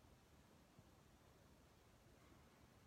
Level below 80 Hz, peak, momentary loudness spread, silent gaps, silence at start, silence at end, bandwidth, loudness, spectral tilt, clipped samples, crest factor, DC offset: -78 dBFS; -56 dBFS; 1 LU; none; 0 s; 0 s; 15.5 kHz; -70 LUFS; -5 dB/octave; under 0.1%; 14 dB; under 0.1%